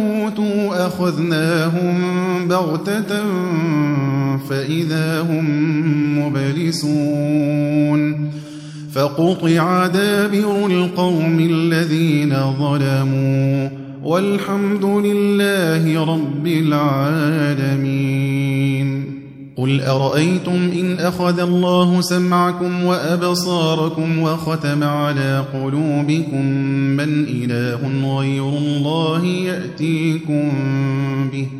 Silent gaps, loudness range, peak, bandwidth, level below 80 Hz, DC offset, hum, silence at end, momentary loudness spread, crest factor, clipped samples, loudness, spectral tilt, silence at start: none; 2 LU; -2 dBFS; 15 kHz; -58 dBFS; under 0.1%; none; 0 s; 5 LU; 14 dB; under 0.1%; -18 LUFS; -6.5 dB/octave; 0 s